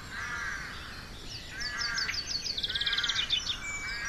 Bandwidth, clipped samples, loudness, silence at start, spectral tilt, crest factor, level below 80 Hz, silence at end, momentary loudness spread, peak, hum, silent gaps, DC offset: 13 kHz; under 0.1%; -31 LUFS; 0 s; -0.5 dB/octave; 16 dB; -48 dBFS; 0 s; 14 LU; -18 dBFS; none; none; under 0.1%